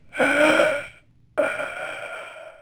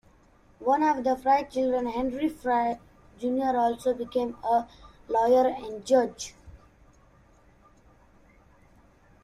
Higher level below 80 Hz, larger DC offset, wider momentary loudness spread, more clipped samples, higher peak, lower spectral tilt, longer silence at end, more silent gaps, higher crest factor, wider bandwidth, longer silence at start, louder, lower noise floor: about the same, -60 dBFS vs -58 dBFS; neither; first, 19 LU vs 10 LU; neither; first, -6 dBFS vs -10 dBFS; about the same, -3.5 dB/octave vs -4.5 dB/octave; second, 0.1 s vs 2.7 s; neither; about the same, 18 dB vs 18 dB; first, over 20 kHz vs 13.5 kHz; second, 0.15 s vs 0.6 s; first, -22 LUFS vs -26 LUFS; second, -51 dBFS vs -59 dBFS